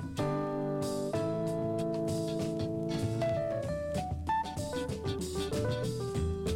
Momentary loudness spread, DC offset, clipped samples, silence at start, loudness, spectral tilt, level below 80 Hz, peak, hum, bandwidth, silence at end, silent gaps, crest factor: 3 LU; under 0.1%; under 0.1%; 0 s; -34 LUFS; -6.5 dB/octave; -48 dBFS; -22 dBFS; none; 16.5 kHz; 0 s; none; 12 dB